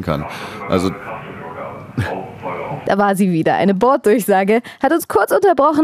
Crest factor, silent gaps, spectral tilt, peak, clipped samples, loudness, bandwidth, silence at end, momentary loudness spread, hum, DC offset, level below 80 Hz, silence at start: 16 dB; none; -6 dB/octave; -2 dBFS; under 0.1%; -16 LUFS; 15.5 kHz; 0 s; 16 LU; none; under 0.1%; -48 dBFS; 0 s